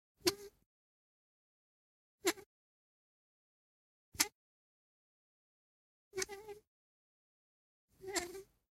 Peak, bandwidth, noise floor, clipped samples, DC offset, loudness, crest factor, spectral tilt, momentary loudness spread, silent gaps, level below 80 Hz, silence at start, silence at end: -12 dBFS; 16 kHz; under -90 dBFS; under 0.1%; under 0.1%; -39 LUFS; 34 dB; -1 dB/octave; 18 LU; 0.66-2.18 s, 2.46-4.12 s, 4.35-6.11 s, 6.67-7.88 s; -76 dBFS; 0.25 s; 0.35 s